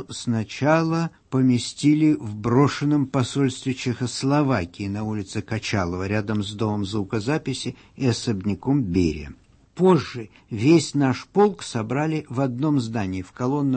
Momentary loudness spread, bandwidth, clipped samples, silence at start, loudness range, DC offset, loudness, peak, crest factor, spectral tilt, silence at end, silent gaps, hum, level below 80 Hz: 10 LU; 8.8 kHz; under 0.1%; 0 s; 4 LU; under 0.1%; -23 LUFS; -4 dBFS; 18 dB; -6.5 dB/octave; 0 s; none; none; -50 dBFS